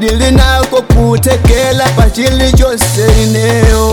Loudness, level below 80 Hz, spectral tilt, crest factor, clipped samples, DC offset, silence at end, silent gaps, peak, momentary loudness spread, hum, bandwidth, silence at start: -9 LUFS; -12 dBFS; -5 dB/octave; 8 dB; under 0.1%; under 0.1%; 0 s; none; 0 dBFS; 2 LU; none; 19 kHz; 0 s